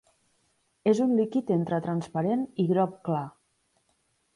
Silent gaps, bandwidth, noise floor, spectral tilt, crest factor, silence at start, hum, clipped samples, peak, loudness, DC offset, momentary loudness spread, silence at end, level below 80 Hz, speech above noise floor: none; 11 kHz; -72 dBFS; -8.5 dB/octave; 18 dB; 0.85 s; none; under 0.1%; -10 dBFS; -27 LUFS; under 0.1%; 7 LU; 1.05 s; -70 dBFS; 46 dB